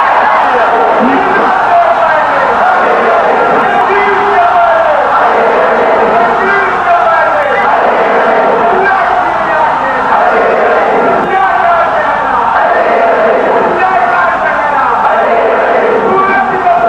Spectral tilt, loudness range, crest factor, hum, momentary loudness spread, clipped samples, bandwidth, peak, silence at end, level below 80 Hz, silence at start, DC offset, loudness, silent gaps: -5.5 dB/octave; 1 LU; 8 dB; none; 2 LU; under 0.1%; 9.6 kHz; 0 dBFS; 0 s; -42 dBFS; 0 s; under 0.1%; -8 LUFS; none